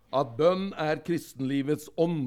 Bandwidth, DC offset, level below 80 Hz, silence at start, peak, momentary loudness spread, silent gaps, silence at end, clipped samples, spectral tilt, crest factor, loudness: 16.5 kHz; under 0.1%; -68 dBFS; 0.1 s; -12 dBFS; 6 LU; none; 0 s; under 0.1%; -6.5 dB/octave; 16 dB; -28 LUFS